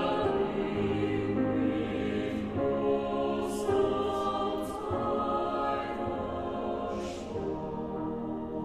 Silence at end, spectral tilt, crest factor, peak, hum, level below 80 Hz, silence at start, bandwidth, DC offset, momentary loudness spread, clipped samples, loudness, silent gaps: 0 s; -6.5 dB/octave; 14 dB; -16 dBFS; none; -52 dBFS; 0 s; 14 kHz; under 0.1%; 7 LU; under 0.1%; -31 LUFS; none